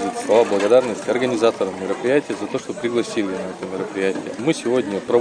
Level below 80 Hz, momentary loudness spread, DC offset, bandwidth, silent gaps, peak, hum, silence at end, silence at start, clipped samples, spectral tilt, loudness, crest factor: -62 dBFS; 10 LU; under 0.1%; 10 kHz; none; -2 dBFS; none; 0 s; 0 s; under 0.1%; -5 dB/octave; -20 LUFS; 18 dB